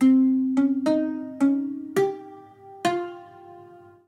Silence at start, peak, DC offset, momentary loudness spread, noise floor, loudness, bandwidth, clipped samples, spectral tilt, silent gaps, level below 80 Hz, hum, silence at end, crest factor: 0 s; -8 dBFS; under 0.1%; 17 LU; -48 dBFS; -24 LUFS; 12 kHz; under 0.1%; -6 dB/octave; none; -78 dBFS; none; 0.3 s; 14 dB